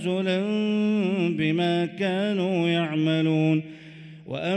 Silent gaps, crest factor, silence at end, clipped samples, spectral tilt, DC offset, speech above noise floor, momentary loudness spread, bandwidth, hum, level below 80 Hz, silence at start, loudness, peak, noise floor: none; 12 dB; 0 s; under 0.1%; -7.5 dB/octave; under 0.1%; 20 dB; 13 LU; 9 kHz; none; -68 dBFS; 0 s; -24 LUFS; -12 dBFS; -44 dBFS